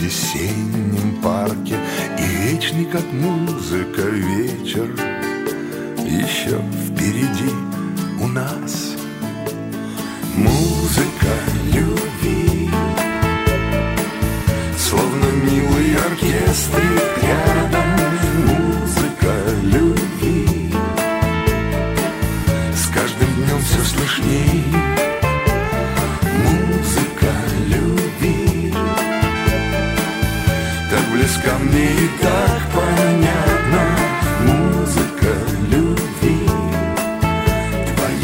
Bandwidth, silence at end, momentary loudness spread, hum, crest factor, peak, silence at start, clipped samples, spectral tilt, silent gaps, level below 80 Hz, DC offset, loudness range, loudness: 16.5 kHz; 0 s; 6 LU; none; 16 dB; 0 dBFS; 0 s; under 0.1%; -5.5 dB/octave; none; -28 dBFS; under 0.1%; 5 LU; -18 LUFS